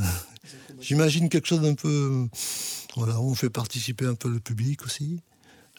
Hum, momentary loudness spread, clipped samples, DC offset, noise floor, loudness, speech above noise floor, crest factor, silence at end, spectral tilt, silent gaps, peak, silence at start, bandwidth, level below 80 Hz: none; 11 LU; under 0.1%; under 0.1%; -47 dBFS; -26 LUFS; 22 dB; 18 dB; 0.6 s; -5 dB/octave; none; -10 dBFS; 0 s; 19.5 kHz; -56 dBFS